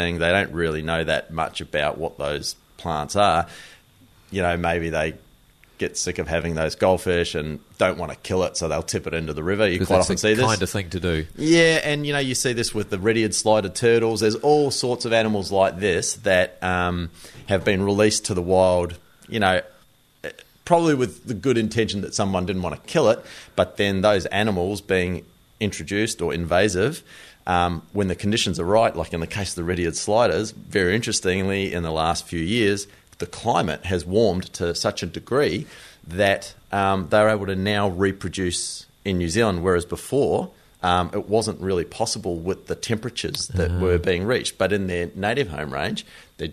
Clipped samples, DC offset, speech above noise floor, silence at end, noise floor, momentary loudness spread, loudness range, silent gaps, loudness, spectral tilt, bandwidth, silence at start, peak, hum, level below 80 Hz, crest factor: under 0.1%; under 0.1%; 34 dB; 0 s; -56 dBFS; 9 LU; 4 LU; none; -22 LUFS; -4.5 dB/octave; 13.5 kHz; 0 s; -2 dBFS; none; -44 dBFS; 20 dB